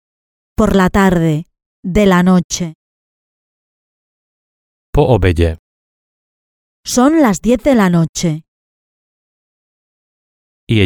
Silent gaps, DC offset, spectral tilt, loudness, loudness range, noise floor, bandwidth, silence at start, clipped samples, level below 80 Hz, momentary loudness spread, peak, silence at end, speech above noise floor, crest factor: 1.66-1.83 s, 2.44-2.50 s, 2.75-4.93 s, 5.59-6.83 s, 8.09-8.13 s, 8.48-10.67 s; under 0.1%; -6 dB/octave; -13 LUFS; 5 LU; under -90 dBFS; 18.5 kHz; 0.6 s; under 0.1%; -30 dBFS; 14 LU; 0 dBFS; 0 s; over 78 dB; 16 dB